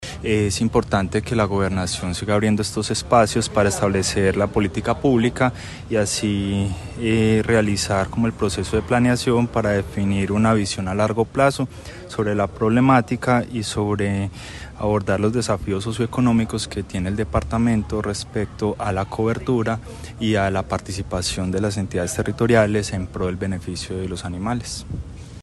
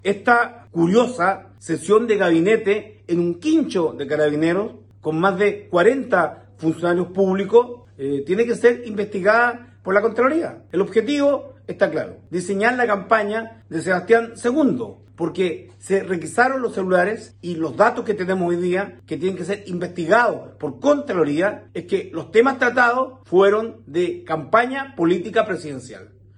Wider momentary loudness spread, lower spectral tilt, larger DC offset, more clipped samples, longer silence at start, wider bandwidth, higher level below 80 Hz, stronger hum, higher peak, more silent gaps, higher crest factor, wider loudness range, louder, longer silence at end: about the same, 9 LU vs 11 LU; about the same, -5.5 dB/octave vs -6 dB/octave; neither; neither; about the same, 0 s vs 0.05 s; first, 12.5 kHz vs 11 kHz; first, -38 dBFS vs -62 dBFS; neither; about the same, -2 dBFS vs -2 dBFS; neither; about the same, 18 dB vs 18 dB; about the same, 3 LU vs 2 LU; about the same, -21 LUFS vs -20 LUFS; second, 0 s vs 0.35 s